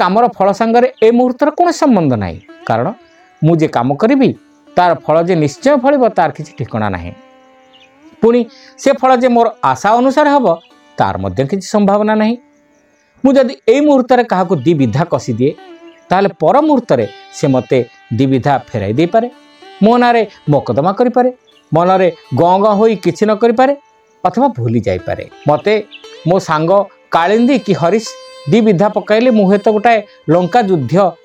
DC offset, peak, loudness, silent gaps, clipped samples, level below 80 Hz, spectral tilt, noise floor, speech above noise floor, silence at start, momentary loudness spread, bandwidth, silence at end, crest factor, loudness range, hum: under 0.1%; 0 dBFS; -12 LUFS; none; under 0.1%; -50 dBFS; -7 dB/octave; -52 dBFS; 41 dB; 0 s; 8 LU; 10.5 kHz; 0.1 s; 12 dB; 3 LU; none